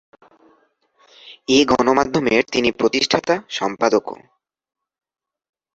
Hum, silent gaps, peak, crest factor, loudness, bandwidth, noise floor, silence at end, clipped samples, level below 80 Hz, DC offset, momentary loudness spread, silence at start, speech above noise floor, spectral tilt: none; none; -2 dBFS; 20 dB; -18 LUFS; 8 kHz; -60 dBFS; 1.6 s; under 0.1%; -54 dBFS; under 0.1%; 9 LU; 1.25 s; 42 dB; -4 dB/octave